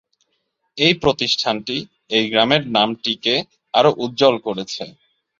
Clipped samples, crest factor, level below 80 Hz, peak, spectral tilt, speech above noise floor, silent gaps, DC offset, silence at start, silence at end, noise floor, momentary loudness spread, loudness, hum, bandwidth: under 0.1%; 18 dB; -54 dBFS; -2 dBFS; -4.5 dB/octave; 53 dB; none; under 0.1%; 0.75 s; 0.5 s; -71 dBFS; 11 LU; -18 LUFS; none; 7.6 kHz